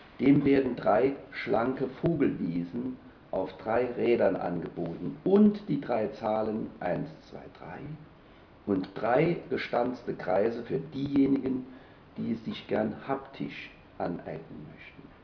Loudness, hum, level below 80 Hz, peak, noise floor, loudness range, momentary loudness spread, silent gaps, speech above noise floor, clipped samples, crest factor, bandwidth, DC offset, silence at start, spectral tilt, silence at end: -29 LUFS; none; -60 dBFS; -12 dBFS; -54 dBFS; 6 LU; 19 LU; none; 25 dB; under 0.1%; 18 dB; 5.4 kHz; under 0.1%; 0 s; -9.5 dB/octave; 0.15 s